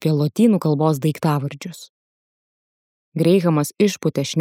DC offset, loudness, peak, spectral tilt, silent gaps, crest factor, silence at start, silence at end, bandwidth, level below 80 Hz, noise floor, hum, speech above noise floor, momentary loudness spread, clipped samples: under 0.1%; -19 LUFS; -4 dBFS; -6.5 dB/octave; 1.89-3.12 s; 16 dB; 0 s; 0 s; 16.5 kHz; -68 dBFS; under -90 dBFS; none; over 72 dB; 13 LU; under 0.1%